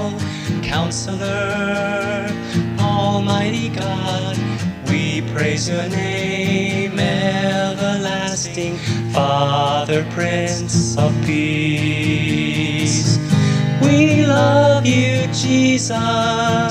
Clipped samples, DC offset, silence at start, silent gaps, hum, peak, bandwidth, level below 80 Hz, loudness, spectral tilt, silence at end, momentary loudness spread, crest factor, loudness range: under 0.1%; under 0.1%; 0 s; none; none; -2 dBFS; 15 kHz; -46 dBFS; -18 LUFS; -5 dB/octave; 0 s; 8 LU; 16 dB; 5 LU